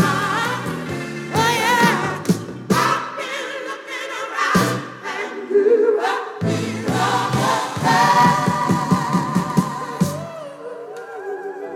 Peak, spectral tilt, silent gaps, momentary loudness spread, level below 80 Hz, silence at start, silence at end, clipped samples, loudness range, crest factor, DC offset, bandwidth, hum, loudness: -2 dBFS; -5 dB/octave; none; 14 LU; -54 dBFS; 0 s; 0 s; under 0.1%; 4 LU; 16 dB; under 0.1%; 17.5 kHz; none; -19 LUFS